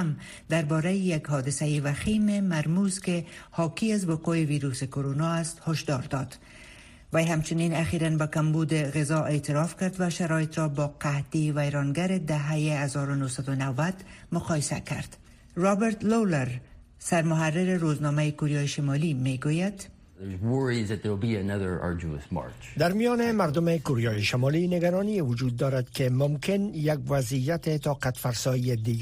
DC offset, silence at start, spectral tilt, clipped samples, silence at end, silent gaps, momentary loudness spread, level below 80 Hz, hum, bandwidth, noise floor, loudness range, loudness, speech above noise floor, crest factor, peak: under 0.1%; 0 s; -6 dB/octave; under 0.1%; 0 s; none; 8 LU; -54 dBFS; none; 15.5 kHz; -49 dBFS; 3 LU; -27 LUFS; 23 dB; 16 dB; -10 dBFS